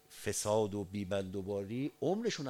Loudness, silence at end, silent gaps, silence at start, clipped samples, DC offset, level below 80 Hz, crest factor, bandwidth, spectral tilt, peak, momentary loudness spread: -36 LUFS; 0 s; none; 0.1 s; under 0.1%; under 0.1%; -68 dBFS; 18 dB; 16.5 kHz; -5 dB/octave; -20 dBFS; 6 LU